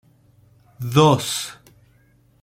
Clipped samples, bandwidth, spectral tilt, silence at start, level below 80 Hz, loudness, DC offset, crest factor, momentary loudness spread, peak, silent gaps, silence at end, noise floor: under 0.1%; 16.5 kHz; -5 dB/octave; 0.8 s; -56 dBFS; -18 LUFS; under 0.1%; 22 dB; 18 LU; -2 dBFS; none; 0.9 s; -57 dBFS